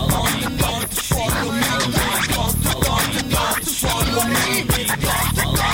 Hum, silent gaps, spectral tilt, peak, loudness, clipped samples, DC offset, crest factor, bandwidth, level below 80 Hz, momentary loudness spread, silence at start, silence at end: none; none; -3.5 dB/octave; -2 dBFS; -19 LUFS; under 0.1%; under 0.1%; 16 dB; 17 kHz; -30 dBFS; 2 LU; 0 s; 0 s